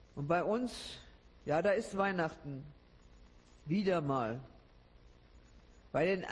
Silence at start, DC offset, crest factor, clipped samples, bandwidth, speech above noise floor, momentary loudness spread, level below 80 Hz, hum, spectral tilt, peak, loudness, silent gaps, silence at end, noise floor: 0.15 s; under 0.1%; 18 dB; under 0.1%; 12 kHz; 26 dB; 15 LU; -62 dBFS; none; -6.5 dB/octave; -20 dBFS; -35 LUFS; none; 0 s; -61 dBFS